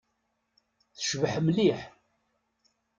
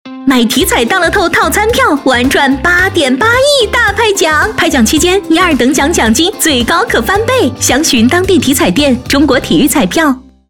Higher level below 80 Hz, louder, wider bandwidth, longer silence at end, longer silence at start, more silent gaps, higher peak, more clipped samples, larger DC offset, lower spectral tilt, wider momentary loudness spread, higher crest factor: second, -66 dBFS vs -28 dBFS; second, -28 LUFS vs -9 LUFS; second, 9.2 kHz vs 19.5 kHz; first, 1.1 s vs 0.3 s; first, 1 s vs 0.05 s; neither; second, -12 dBFS vs 0 dBFS; neither; second, under 0.1% vs 0.4%; first, -5 dB/octave vs -3 dB/octave; first, 13 LU vs 2 LU; first, 20 dB vs 8 dB